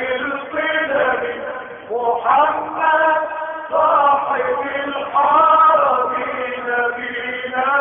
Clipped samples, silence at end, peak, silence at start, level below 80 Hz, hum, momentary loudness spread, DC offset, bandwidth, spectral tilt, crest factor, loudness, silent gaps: under 0.1%; 0 s; -2 dBFS; 0 s; -58 dBFS; none; 11 LU; under 0.1%; 3.7 kHz; -8.5 dB/octave; 14 dB; -17 LUFS; none